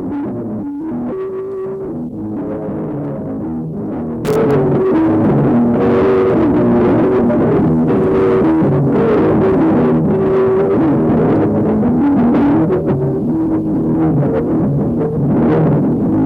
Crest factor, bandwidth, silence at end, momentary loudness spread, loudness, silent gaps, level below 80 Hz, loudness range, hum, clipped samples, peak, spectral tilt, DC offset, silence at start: 8 dB; 7.8 kHz; 0 s; 10 LU; -14 LUFS; none; -38 dBFS; 9 LU; none; under 0.1%; -4 dBFS; -10 dB/octave; under 0.1%; 0 s